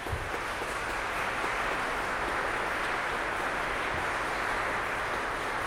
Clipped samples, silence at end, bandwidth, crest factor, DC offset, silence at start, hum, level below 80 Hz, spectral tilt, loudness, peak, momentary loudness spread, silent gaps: under 0.1%; 0 s; 16 kHz; 14 dB; under 0.1%; 0 s; none; -48 dBFS; -3.5 dB/octave; -31 LUFS; -18 dBFS; 3 LU; none